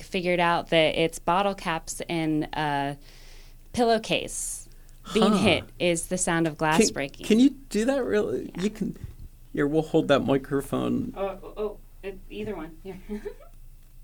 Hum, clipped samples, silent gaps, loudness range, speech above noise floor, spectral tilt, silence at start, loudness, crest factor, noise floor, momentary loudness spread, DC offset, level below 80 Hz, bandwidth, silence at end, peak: none; under 0.1%; none; 5 LU; 21 dB; -4.5 dB/octave; 0 s; -25 LUFS; 22 dB; -46 dBFS; 16 LU; under 0.1%; -46 dBFS; 19 kHz; 0 s; -4 dBFS